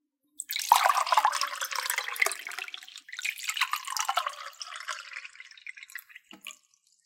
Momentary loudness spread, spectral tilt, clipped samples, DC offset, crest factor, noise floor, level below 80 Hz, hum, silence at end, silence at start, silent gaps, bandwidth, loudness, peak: 20 LU; 3.5 dB/octave; under 0.1%; under 0.1%; 28 dB; -67 dBFS; under -90 dBFS; none; 0.55 s; 0.4 s; none; 17 kHz; -29 LUFS; -2 dBFS